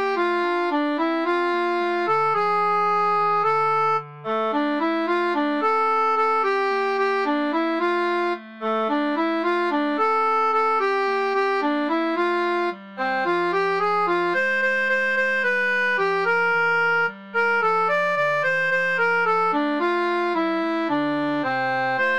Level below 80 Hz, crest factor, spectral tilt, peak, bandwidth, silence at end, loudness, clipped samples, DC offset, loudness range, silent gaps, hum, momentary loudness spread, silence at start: -76 dBFS; 10 dB; -5.5 dB/octave; -10 dBFS; 10.5 kHz; 0 s; -21 LUFS; under 0.1%; 0.2%; 2 LU; none; none; 3 LU; 0 s